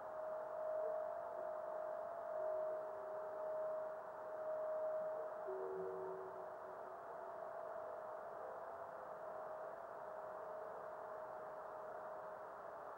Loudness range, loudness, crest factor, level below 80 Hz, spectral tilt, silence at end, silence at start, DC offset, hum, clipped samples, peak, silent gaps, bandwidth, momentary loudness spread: 5 LU; -48 LUFS; 14 dB; -86 dBFS; -6.5 dB/octave; 0 s; 0 s; under 0.1%; none; under 0.1%; -34 dBFS; none; 16 kHz; 8 LU